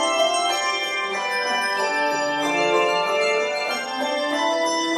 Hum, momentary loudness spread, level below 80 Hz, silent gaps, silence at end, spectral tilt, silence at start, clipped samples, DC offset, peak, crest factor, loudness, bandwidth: none; 4 LU; -68 dBFS; none; 0 s; -1.5 dB/octave; 0 s; under 0.1%; under 0.1%; -8 dBFS; 14 dB; -21 LUFS; 14 kHz